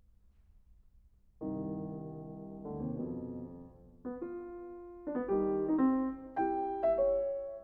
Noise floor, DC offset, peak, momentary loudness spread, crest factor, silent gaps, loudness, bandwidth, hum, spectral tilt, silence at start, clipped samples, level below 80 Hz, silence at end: -63 dBFS; under 0.1%; -18 dBFS; 16 LU; 18 dB; none; -36 LUFS; 3.4 kHz; none; -9.5 dB/octave; 0.55 s; under 0.1%; -60 dBFS; 0 s